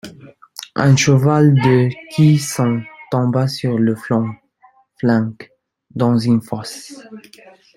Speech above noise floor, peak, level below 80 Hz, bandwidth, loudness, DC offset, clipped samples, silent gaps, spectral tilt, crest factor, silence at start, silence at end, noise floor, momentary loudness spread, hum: 38 dB; 0 dBFS; -54 dBFS; 15.5 kHz; -16 LUFS; under 0.1%; under 0.1%; none; -6.5 dB/octave; 16 dB; 0.05 s; 0.55 s; -53 dBFS; 20 LU; none